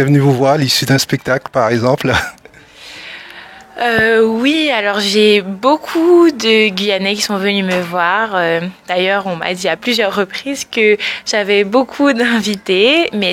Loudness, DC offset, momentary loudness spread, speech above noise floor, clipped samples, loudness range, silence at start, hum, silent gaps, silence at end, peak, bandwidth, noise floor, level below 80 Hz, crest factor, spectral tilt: -13 LUFS; under 0.1%; 9 LU; 26 dB; under 0.1%; 4 LU; 0 s; none; none; 0 s; 0 dBFS; 16.5 kHz; -39 dBFS; -48 dBFS; 14 dB; -4.5 dB/octave